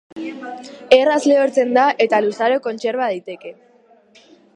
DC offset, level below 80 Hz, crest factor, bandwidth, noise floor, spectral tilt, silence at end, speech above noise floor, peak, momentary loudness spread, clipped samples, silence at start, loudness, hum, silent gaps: under 0.1%; -68 dBFS; 18 dB; 10.5 kHz; -51 dBFS; -4 dB/octave; 1.05 s; 34 dB; 0 dBFS; 19 LU; under 0.1%; 0.15 s; -16 LUFS; none; none